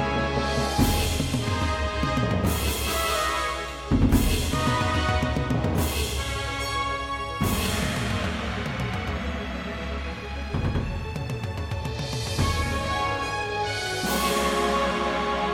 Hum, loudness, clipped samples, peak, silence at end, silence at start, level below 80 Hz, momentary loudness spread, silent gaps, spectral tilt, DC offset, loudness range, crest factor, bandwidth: none; -26 LUFS; under 0.1%; -6 dBFS; 0 s; 0 s; -34 dBFS; 8 LU; none; -4.5 dB/octave; under 0.1%; 5 LU; 18 dB; 17 kHz